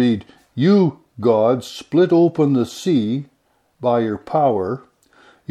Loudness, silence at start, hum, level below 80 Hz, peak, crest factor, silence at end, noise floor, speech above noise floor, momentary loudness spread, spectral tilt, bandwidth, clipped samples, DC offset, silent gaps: -18 LUFS; 0 s; none; -62 dBFS; -2 dBFS; 16 dB; 0.75 s; -63 dBFS; 46 dB; 11 LU; -7.5 dB/octave; 13.5 kHz; under 0.1%; under 0.1%; none